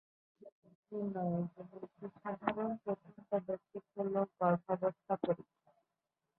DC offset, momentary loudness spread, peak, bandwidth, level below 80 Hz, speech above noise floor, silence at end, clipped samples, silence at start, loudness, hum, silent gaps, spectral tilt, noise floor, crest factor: under 0.1%; 14 LU; -16 dBFS; 4.2 kHz; -80 dBFS; 51 dB; 0.95 s; under 0.1%; 0.4 s; -39 LUFS; none; 0.52-0.62 s, 0.75-0.83 s; -7.5 dB/octave; -89 dBFS; 24 dB